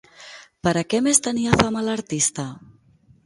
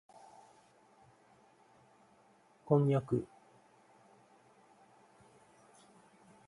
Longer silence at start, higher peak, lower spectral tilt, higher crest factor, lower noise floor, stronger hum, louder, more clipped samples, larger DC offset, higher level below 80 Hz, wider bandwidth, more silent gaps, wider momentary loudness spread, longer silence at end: second, 0.2 s vs 2.7 s; first, 0 dBFS vs -14 dBFS; second, -3.5 dB/octave vs -9.5 dB/octave; about the same, 22 dB vs 26 dB; second, -56 dBFS vs -67 dBFS; neither; first, -20 LUFS vs -32 LUFS; neither; neither; first, -46 dBFS vs -74 dBFS; about the same, 11.5 kHz vs 11 kHz; neither; second, 20 LU vs 29 LU; second, 0.65 s vs 3.25 s